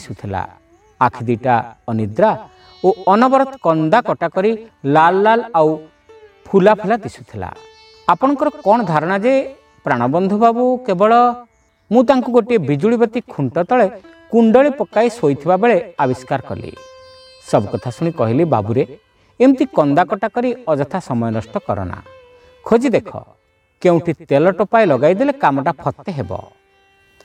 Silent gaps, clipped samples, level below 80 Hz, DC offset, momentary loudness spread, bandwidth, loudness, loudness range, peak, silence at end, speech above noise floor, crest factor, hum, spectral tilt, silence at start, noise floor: none; under 0.1%; -54 dBFS; under 0.1%; 13 LU; 10.5 kHz; -16 LUFS; 4 LU; 0 dBFS; 0.85 s; 39 dB; 16 dB; none; -7.5 dB/octave; 0 s; -54 dBFS